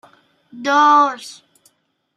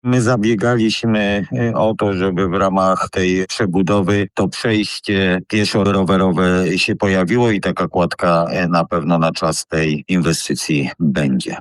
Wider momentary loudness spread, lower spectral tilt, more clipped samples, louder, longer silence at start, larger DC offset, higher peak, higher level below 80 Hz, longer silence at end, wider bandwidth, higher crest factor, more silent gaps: first, 21 LU vs 4 LU; second, -2 dB/octave vs -5.5 dB/octave; neither; about the same, -14 LUFS vs -16 LUFS; first, 0.55 s vs 0.05 s; neither; about the same, -2 dBFS vs -2 dBFS; second, -78 dBFS vs -44 dBFS; first, 0.85 s vs 0 s; about the same, 13 kHz vs 12.5 kHz; about the same, 16 dB vs 14 dB; neither